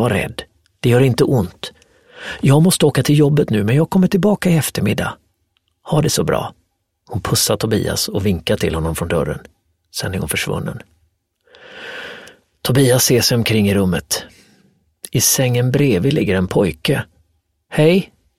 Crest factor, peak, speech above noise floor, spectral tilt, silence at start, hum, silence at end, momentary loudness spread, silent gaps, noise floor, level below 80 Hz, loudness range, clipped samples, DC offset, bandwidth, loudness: 16 dB; 0 dBFS; 51 dB; -5 dB/octave; 0 s; none; 0.35 s; 17 LU; none; -66 dBFS; -42 dBFS; 7 LU; under 0.1%; under 0.1%; 16.5 kHz; -16 LUFS